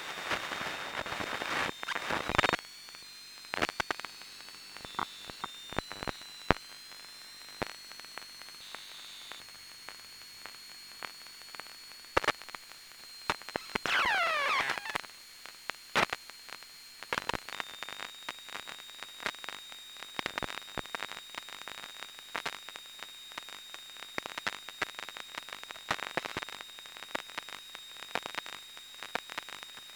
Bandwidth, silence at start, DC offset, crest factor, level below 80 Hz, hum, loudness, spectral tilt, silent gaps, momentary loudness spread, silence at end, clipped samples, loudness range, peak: over 20 kHz; 0 s; under 0.1%; 38 dB; -62 dBFS; none; -37 LUFS; -2.5 dB/octave; none; 15 LU; 0 s; under 0.1%; 10 LU; 0 dBFS